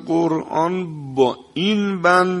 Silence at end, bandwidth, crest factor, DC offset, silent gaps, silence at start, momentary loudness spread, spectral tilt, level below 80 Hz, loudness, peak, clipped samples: 0 s; 11.5 kHz; 18 dB; under 0.1%; none; 0 s; 7 LU; -6 dB/octave; -62 dBFS; -19 LUFS; -2 dBFS; under 0.1%